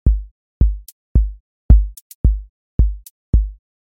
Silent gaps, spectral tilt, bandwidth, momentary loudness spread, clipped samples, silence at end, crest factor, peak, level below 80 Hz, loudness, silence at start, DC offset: 0.31-0.60 s, 0.92-1.15 s, 1.40-1.69 s, 2.01-2.24 s, 2.49-2.79 s, 3.10-3.33 s; -9.5 dB/octave; 1.2 kHz; 14 LU; under 0.1%; 0.35 s; 16 dB; 0 dBFS; -18 dBFS; -20 LUFS; 0.05 s; under 0.1%